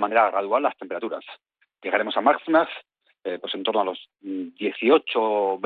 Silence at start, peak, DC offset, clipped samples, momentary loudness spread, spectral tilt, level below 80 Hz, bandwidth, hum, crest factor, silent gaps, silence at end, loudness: 0 s; -6 dBFS; under 0.1%; under 0.1%; 16 LU; -8 dB/octave; -72 dBFS; 4.7 kHz; none; 18 dB; none; 0 s; -23 LUFS